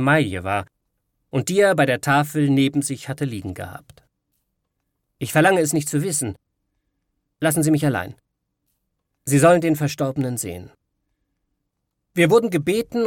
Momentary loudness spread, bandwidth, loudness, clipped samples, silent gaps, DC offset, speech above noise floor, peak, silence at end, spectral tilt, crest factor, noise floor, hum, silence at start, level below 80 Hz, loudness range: 14 LU; 17.5 kHz; -20 LUFS; under 0.1%; none; under 0.1%; 57 dB; -2 dBFS; 0 s; -5 dB/octave; 18 dB; -77 dBFS; none; 0 s; -58 dBFS; 3 LU